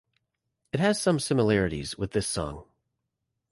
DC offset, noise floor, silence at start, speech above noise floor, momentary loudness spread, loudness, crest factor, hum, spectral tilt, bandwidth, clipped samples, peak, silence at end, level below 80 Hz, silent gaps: under 0.1%; -82 dBFS; 0.75 s; 56 dB; 11 LU; -27 LUFS; 18 dB; none; -5 dB/octave; 12 kHz; under 0.1%; -10 dBFS; 0.9 s; -50 dBFS; none